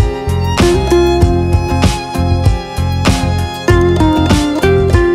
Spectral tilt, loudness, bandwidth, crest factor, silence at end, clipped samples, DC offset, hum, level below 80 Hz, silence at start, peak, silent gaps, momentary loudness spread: -6 dB/octave; -12 LUFS; 15.5 kHz; 10 dB; 0 s; under 0.1%; under 0.1%; none; -18 dBFS; 0 s; 0 dBFS; none; 6 LU